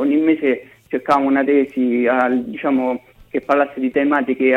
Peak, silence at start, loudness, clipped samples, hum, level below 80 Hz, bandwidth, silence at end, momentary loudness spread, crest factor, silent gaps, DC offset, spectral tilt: -2 dBFS; 0 s; -18 LUFS; under 0.1%; none; -58 dBFS; 6 kHz; 0 s; 10 LU; 14 dB; none; under 0.1%; -7 dB/octave